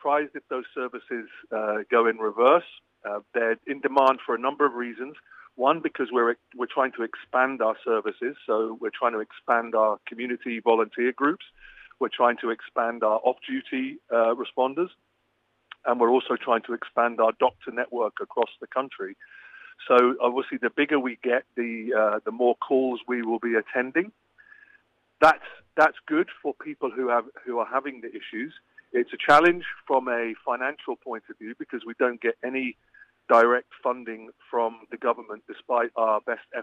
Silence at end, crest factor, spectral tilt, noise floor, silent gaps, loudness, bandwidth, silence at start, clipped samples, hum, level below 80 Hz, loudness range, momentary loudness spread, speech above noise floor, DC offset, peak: 0 s; 20 dB; -5.5 dB/octave; -72 dBFS; none; -25 LUFS; 9.6 kHz; 0.05 s; under 0.1%; none; -72 dBFS; 3 LU; 14 LU; 46 dB; under 0.1%; -6 dBFS